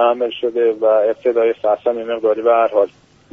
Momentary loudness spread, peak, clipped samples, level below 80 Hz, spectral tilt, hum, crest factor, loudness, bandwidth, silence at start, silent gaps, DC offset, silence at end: 5 LU; -2 dBFS; under 0.1%; -64 dBFS; -2 dB/octave; none; 14 dB; -16 LUFS; 3.9 kHz; 0 s; none; under 0.1%; 0.45 s